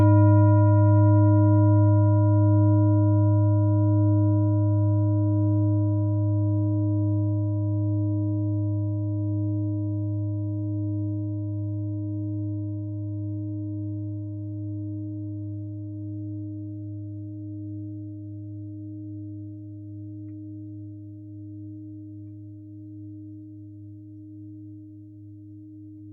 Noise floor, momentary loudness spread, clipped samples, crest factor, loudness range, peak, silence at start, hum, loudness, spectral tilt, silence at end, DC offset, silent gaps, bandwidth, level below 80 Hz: -44 dBFS; 23 LU; under 0.1%; 16 dB; 21 LU; -8 dBFS; 0 s; none; -24 LUFS; -15 dB/octave; 0 s; under 0.1%; none; 2 kHz; -64 dBFS